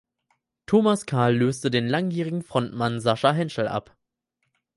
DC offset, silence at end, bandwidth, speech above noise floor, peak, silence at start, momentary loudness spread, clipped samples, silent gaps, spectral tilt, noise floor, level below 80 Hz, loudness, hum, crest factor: under 0.1%; 0.95 s; 11.5 kHz; 55 dB; -6 dBFS; 0.7 s; 7 LU; under 0.1%; none; -6 dB/octave; -78 dBFS; -62 dBFS; -24 LUFS; none; 20 dB